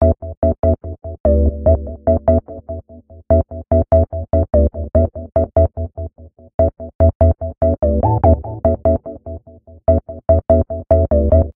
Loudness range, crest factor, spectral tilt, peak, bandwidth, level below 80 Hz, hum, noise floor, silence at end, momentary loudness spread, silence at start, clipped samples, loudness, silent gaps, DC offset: 1 LU; 16 dB; -14 dB/octave; 0 dBFS; 2.1 kHz; -22 dBFS; none; -42 dBFS; 0.05 s; 15 LU; 0 s; under 0.1%; -16 LUFS; 0.37-0.42 s, 1.20-1.24 s, 6.54-6.59 s, 6.95-6.99 s, 7.15-7.20 s; under 0.1%